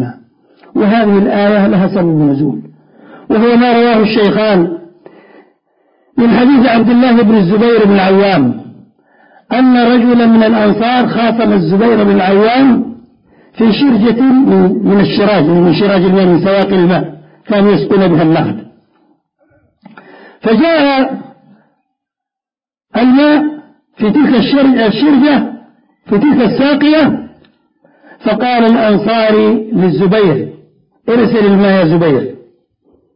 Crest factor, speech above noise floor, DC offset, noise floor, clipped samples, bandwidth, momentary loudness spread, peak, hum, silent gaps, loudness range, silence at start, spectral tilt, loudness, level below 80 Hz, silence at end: 10 dB; over 82 dB; under 0.1%; under -90 dBFS; under 0.1%; 5.4 kHz; 9 LU; 0 dBFS; none; none; 5 LU; 0 s; -10.5 dB/octave; -9 LUFS; -48 dBFS; 0.8 s